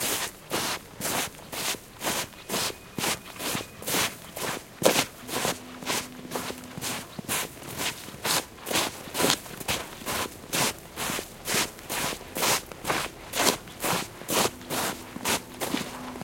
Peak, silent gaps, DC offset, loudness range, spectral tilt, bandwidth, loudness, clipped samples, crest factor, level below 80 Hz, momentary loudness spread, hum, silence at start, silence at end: 0 dBFS; none; under 0.1%; 3 LU; -2 dB/octave; 17 kHz; -29 LUFS; under 0.1%; 30 dB; -56 dBFS; 8 LU; none; 0 s; 0 s